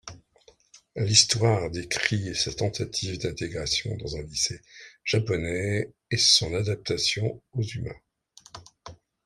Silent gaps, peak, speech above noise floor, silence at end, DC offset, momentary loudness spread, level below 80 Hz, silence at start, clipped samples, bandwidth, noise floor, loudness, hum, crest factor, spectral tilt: none; -2 dBFS; 33 dB; 0.3 s; under 0.1%; 16 LU; -52 dBFS; 0.05 s; under 0.1%; 14.5 kHz; -60 dBFS; -25 LUFS; none; 26 dB; -3 dB/octave